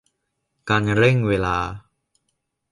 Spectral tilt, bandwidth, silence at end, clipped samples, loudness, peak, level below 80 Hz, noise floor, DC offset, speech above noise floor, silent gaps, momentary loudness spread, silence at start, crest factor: -7 dB/octave; 11 kHz; 0.9 s; under 0.1%; -20 LUFS; -4 dBFS; -44 dBFS; -75 dBFS; under 0.1%; 56 dB; none; 19 LU; 0.65 s; 20 dB